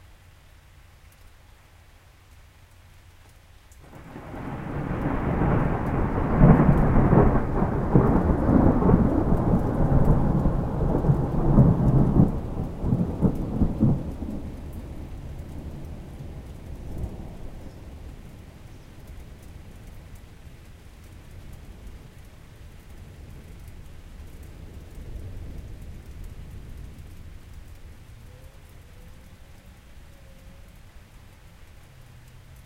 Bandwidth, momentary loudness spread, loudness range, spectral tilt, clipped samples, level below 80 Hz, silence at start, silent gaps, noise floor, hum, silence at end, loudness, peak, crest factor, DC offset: 12.5 kHz; 27 LU; 25 LU; -10 dB/octave; under 0.1%; -32 dBFS; 3.9 s; none; -52 dBFS; none; 0.05 s; -23 LUFS; -2 dBFS; 24 dB; under 0.1%